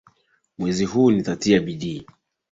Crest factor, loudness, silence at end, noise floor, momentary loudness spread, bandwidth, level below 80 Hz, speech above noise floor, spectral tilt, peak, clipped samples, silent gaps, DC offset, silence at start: 18 dB; -21 LUFS; 0.5 s; -62 dBFS; 12 LU; 7.8 kHz; -54 dBFS; 41 dB; -6 dB/octave; -4 dBFS; under 0.1%; none; under 0.1%; 0.6 s